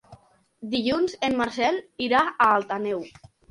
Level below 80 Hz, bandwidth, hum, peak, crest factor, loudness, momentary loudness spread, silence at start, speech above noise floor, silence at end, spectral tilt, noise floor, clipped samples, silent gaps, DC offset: -58 dBFS; 11.5 kHz; none; -8 dBFS; 18 dB; -24 LUFS; 11 LU; 0.1 s; 29 dB; 0.4 s; -4.5 dB/octave; -53 dBFS; under 0.1%; none; under 0.1%